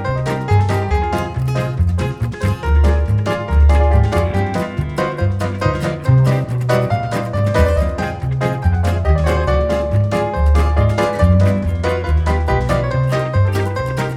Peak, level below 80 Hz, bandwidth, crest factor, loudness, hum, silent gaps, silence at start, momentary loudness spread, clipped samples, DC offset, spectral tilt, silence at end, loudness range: -2 dBFS; -20 dBFS; 12.5 kHz; 14 dB; -17 LUFS; none; none; 0 s; 6 LU; under 0.1%; under 0.1%; -7.5 dB/octave; 0 s; 2 LU